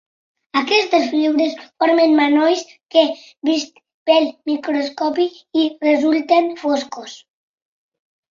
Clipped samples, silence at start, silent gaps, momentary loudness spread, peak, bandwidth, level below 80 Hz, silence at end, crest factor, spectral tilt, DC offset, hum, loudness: under 0.1%; 0.55 s; 3.94-4.06 s; 9 LU; -2 dBFS; 7.4 kHz; -68 dBFS; 1.15 s; 16 dB; -2.5 dB/octave; under 0.1%; none; -17 LUFS